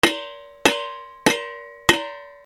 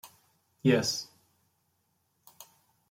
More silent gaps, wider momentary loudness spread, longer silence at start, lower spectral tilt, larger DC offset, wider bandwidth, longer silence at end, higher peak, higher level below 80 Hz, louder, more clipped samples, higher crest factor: neither; second, 15 LU vs 27 LU; about the same, 0.05 s vs 0.05 s; second, -2.5 dB/octave vs -4.5 dB/octave; neither; about the same, 18 kHz vs 16.5 kHz; second, 0.1 s vs 0.45 s; first, 0 dBFS vs -12 dBFS; first, -50 dBFS vs -74 dBFS; first, -21 LUFS vs -28 LUFS; neither; about the same, 22 dB vs 22 dB